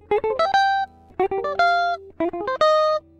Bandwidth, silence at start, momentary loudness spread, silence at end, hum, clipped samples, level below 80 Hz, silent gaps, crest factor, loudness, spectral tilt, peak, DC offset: 10 kHz; 0.1 s; 8 LU; 0.2 s; none; under 0.1%; -54 dBFS; none; 14 dB; -21 LUFS; -4 dB/octave; -6 dBFS; under 0.1%